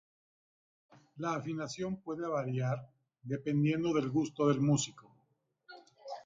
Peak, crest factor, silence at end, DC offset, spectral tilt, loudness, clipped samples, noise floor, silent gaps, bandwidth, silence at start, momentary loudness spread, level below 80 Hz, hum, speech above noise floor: -16 dBFS; 20 dB; 0.05 s; under 0.1%; -6 dB/octave; -34 LUFS; under 0.1%; -77 dBFS; none; 9.6 kHz; 1.15 s; 11 LU; -70 dBFS; none; 44 dB